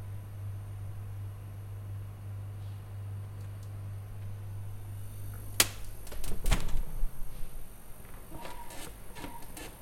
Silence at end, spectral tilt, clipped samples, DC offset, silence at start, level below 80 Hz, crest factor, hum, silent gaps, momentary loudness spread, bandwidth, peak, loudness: 0 s; -3 dB/octave; under 0.1%; under 0.1%; 0 s; -40 dBFS; 32 dB; none; none; 13 LU; 16.5 kHz; -2 dBFS; -39 LUFS